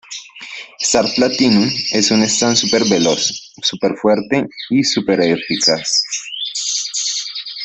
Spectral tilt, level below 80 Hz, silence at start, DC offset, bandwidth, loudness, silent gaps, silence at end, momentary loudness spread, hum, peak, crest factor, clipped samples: -3 dB/octave; -54 dBFS; 0.1 s; under 0.1%; 8.4 kHz; -15 LUFS; none; 0 s; 9 LU; none; 0 dBFS; 16 dB; under 0.1%